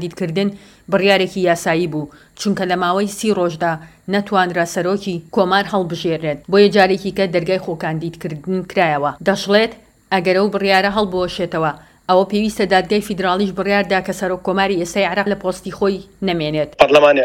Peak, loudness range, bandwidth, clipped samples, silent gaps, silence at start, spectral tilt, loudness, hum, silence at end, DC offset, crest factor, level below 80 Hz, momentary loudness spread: 0 dBFS; 2 LU; 17 kHz; under 0.1%; none; 0 s; -5 dB/octave; -17 LUFS; none; 0 s; under 0.1%; 16 dB; -48 dBFS; 8 LU